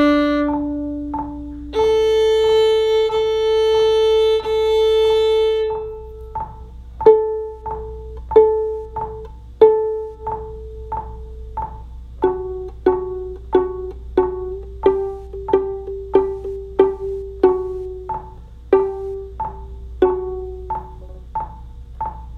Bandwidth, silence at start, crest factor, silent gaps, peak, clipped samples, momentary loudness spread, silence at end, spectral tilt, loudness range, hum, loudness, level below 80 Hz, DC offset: 9.8 kHz; 0 s; 18 dB; none; 0 dBFS; under 0.1%; 17 LU; 0 s; -6 dB/octave; 7 LU; none; -19 LUFS; -36 dBFS; under 0.1%